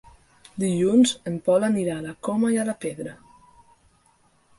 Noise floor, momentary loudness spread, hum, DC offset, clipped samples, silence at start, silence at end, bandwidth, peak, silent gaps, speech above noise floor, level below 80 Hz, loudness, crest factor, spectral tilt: -62 dBFS; 14 LU; none; under 0.1%; under 0.1%; 0.55 s; 1.45 s; 11.5 kHz; -8 dBFS; none; 39 dB; -62 dBFS; -23 LUFS; 18 dB; -5.5 dB/octave